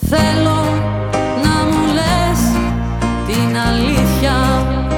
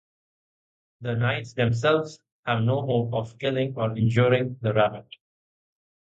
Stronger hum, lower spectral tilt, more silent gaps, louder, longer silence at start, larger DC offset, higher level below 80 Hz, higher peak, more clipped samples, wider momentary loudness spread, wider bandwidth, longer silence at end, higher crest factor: neither; second, -5.5 dB/octave vs -7 dB/octave; second, none vs 2.32-2.43 s; first, -15 LUFS vs -25 LUFS; second, 0 s vs 1 s; neither; first, -24 dBFS vs -56 dBFS; first, -2 dBFS vs -6 dBFS; neither; second, 4 LU vs 9 LU; first, 19.5 kHz vs 8 kHz; second, 0 s vs 1 s; second, 12 dB vs 18 dB